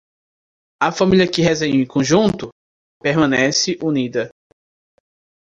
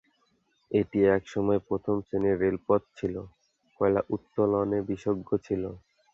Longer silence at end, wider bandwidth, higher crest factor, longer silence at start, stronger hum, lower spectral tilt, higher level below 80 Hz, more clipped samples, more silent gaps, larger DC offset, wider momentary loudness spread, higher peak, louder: first, 1.25 s vs 0.35 s; first, 9.4 kHz vs 7.4 kHz; about the same, 16 dB vs 18 dB; about the same, 0.8 s vs 0.7 s; neither; second, -4.5 dB/octave vs -8.5 dB/octave; first, -50 dBFS vs -56 dBFS; neither; first, 2.52-3.00 s vs none; neither; about the same, 10 LU vs 9 LU; first, -2 dBFS vs -10 dBFS; first, -17 LUFS vs -28 LUFS